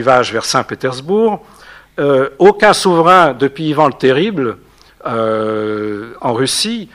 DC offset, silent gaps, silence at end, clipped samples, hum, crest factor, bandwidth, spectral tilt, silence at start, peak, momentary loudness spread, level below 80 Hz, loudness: under 0.1%; none; 0.1 s; 0.2%; none; 14 dB; 15.5 kHz; -4.5 dB/octave; 0 s; 0 dBFS; 13 LU; -50 dBFS; -13 LUFS